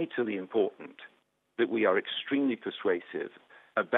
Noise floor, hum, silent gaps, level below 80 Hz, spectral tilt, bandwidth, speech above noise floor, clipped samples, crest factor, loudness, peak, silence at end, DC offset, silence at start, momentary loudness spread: -58 dBFS; none; none; -84 dBFS; -7.5 dB/octave; 4.1 kHz; 28 dB; under 0.1%; 22 dB; -31 LUFS; -10 dBFS; 0 s; under 0.1%; 0 s; 17 LU